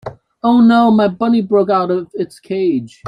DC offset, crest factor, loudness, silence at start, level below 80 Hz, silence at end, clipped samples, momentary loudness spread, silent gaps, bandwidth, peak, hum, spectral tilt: under 0.1%; 12 dB; -14 LUFS; 0.05 s; -56 dBFS; 0 s; under 0.1%; 13 LU; none; 9.8 kHz; -2 dBFS; none; -8 dB/octave